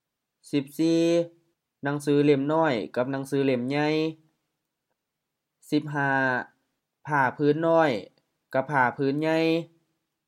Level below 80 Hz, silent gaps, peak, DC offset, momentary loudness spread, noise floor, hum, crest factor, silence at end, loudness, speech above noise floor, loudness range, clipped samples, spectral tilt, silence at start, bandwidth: -78 dBFS; none; -8 dBFS; under 0.1%; 9 LU; -84 dBFS; none; 18 dB; 0.65 s; -25 LUFS; 59 dB; 4 LU; under 0.1%; -6.5 dB/octave; 0.55 s; 15 kHz